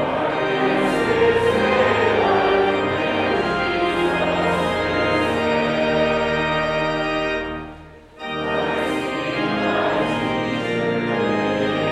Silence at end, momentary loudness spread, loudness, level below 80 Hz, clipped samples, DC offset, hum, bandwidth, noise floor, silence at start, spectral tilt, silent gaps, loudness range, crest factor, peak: 0 s; 6 LU; -20 LUFS; -46 dBFS; under 0.1%; under 0.1%; none; 13 kHz; -41 dBFS; 0 s; -5.5 dB/octave; none; 5 LU; 14 dB; -6 dBFS